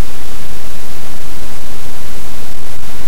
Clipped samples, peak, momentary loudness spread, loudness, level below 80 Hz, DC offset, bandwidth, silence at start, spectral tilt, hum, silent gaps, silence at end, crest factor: 6%; 0 dBFS; 1 LU; -30 LUFS; -36 dBFS; 90%; over 20 kHz; 0 s; -4.5 dB/octave; none; none; 0 s; 14 dB